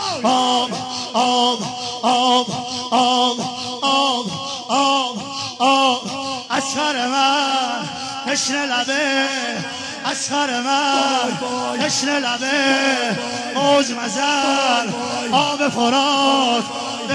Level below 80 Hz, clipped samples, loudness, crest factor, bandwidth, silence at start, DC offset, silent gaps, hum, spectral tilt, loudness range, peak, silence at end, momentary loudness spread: -64 dBFS; under 0.1%; -18 LUFS; 16 dB; 11 kHz; 0 s; under 0.1%; none; none; -2 dB/octave; 2 LU; -4 dBFS; 0 s; 9 LU